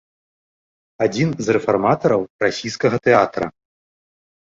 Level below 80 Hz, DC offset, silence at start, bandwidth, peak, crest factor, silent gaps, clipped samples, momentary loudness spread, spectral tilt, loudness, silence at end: -54 dBFS; under 0.1%; 1 s; 7.8 kHz; 0 dBFS; 20 dB; 2.30-2.39 s; under 0.1%; 7 LU; -6 dB/octave; -19 LUFS; 0.9 s